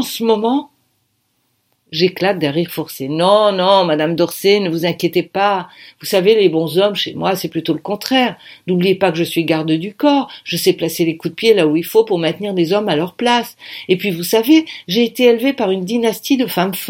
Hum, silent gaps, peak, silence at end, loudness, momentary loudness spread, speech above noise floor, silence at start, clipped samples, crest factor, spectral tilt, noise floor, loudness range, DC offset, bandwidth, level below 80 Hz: none; none; 0 dBFS; 0 s; -15 LUFS; 8 LU; 50 dB; 0 s; under 0.1%; 16 dB; -5 dB/octave; -65 dBFS; 2 LU; under 0.1%; 17 kHz; -64 dBFS